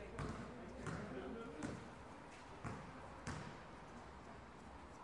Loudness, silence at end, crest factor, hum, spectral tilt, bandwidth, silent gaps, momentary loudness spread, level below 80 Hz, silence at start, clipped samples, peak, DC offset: -52 LUFS; 0 s; 22 dB; none; -5.5 dB/octave; 11 kHz; none; 8 LU; -62 dBFS; 0 s; under 0.1%; -30 dBFS; under 0.1%